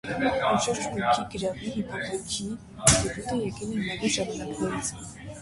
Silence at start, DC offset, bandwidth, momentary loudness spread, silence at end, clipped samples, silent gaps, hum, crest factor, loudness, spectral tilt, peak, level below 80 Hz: 0.05 s; under 0.1%; 12 kHz; 11 LU; 0 s; under 0.1%; none; none; 26 dB; -27 LUFS; -3.5 dB/octave; -2 dBFS; -46 dBFS